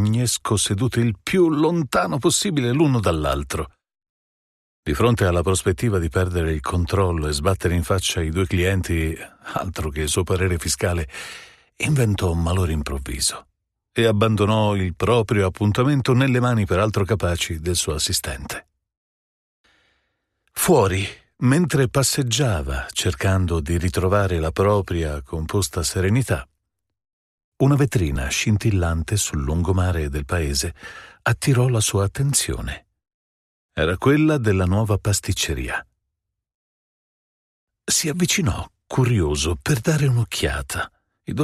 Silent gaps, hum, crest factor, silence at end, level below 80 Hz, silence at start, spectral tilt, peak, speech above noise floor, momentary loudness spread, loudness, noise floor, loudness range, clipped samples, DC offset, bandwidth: 4.09-4.83 s, 18.97-19.64 s, 27.13-27.38 s, 27.44-27.52 s, 33.14-33.69 s, 36.54-37.67 s; none; 18 dB; 0 s; -36 dBFS; 0 s; -5 dB/octave; -4 dBFS; 60 dB; 10 LU; -21 LUFS; -81 dBFS; 4 LU; under 0.1%; under 0.1%; 15 kHz